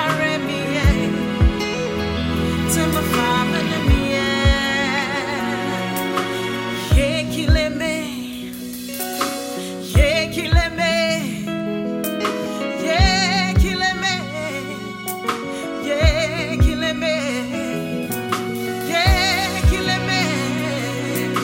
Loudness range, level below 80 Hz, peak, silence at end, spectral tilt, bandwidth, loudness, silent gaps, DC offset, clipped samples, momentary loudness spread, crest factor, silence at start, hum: 3 LU; -26 dBFS; -2 dBFS; 0 s; -4.5 dB/octave; 16.5 kHz; -20 LUFS; none; under 0.1%; under 0.1%; 8 LU; 18 dB; 0 s; none